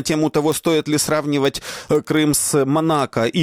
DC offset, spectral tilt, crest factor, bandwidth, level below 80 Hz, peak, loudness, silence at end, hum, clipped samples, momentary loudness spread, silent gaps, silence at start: under 0.1%; -4.5 dB/octave; 12 dB; 19.5 kHz; -50 dBFS; -6 dBFS; -18 LUFS; 0 s; none; under 0.1%; 5 LU; none; 0 s